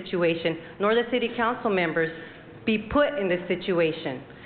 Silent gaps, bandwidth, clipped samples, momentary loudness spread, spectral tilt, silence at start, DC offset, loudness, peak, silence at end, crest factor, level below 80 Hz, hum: none; 4.6 kHz; under 0.1%; 9 LU; -9.5 dB/octave; 0 s; under 0.1%; -26 LUFS; -12 dBFS; 0 s; 14 dB; -52 dBFS; none